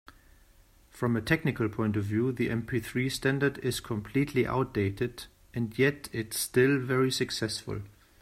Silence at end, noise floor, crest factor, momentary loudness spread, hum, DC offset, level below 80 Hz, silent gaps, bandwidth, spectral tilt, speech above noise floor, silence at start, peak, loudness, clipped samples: 0.3 s; -59 dBFS; 20 dB; 9 LU; none; under 0.1%; -56 dBFS; none; 16 kHz; -5.5 dB/octave; 30 dB; 0.95 s; -10 dBFS; -29 LUFS; under 0.1%